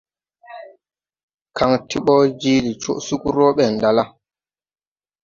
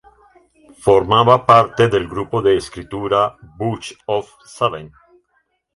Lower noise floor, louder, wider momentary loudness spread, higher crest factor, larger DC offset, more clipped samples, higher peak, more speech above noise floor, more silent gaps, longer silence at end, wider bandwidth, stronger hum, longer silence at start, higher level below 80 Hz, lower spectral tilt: first, under -90 dBFS vs -66 dBFS; about the same, -18 LUFS vs -16 LUFS; about the same, 17 LU vs 15 LU; about the same, 18 dB vs 18 dB; neither; neither; about the same, -2 dBFS vs 0 dBFS; first, over 73 dB vs 49 dB; first, 1.23-1.28 s, 1.34-1.38 s vs none; first, 1.15 s vs 0.9 s; second, 7.6 kHz vs 11.5 kHz; neither; second, 0.5 s vs 0.85 s; second, -52 dBFS vs -46 dBFS; about the same, -5.5 dB/octave vs -6 dB/octave